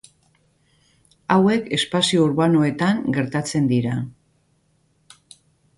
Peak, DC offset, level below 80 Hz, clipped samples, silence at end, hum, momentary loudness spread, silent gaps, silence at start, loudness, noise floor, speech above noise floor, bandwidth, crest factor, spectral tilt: -2 dBFS; under 0.1%; -58 dBFS; under 0.1%; 1.65 s; none; 8 LU; none; 1.3 s; -20 LUFS; -64 dBFS; 45 dB; 11.5 kHz; 20 dB; -5.5 dB/octave